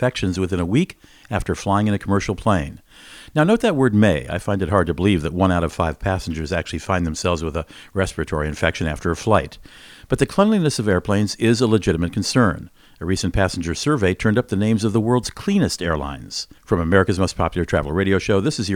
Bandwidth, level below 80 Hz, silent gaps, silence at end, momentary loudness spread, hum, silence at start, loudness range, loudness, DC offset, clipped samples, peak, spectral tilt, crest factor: 16.5 kHz; -38 dBFS; none; 0 s; 8 LU; none; 0 s; 3 LU; -20 LUFS; under 0.1%; under 0.1%; 0 dBFS; -6 dB/octave; 20 dB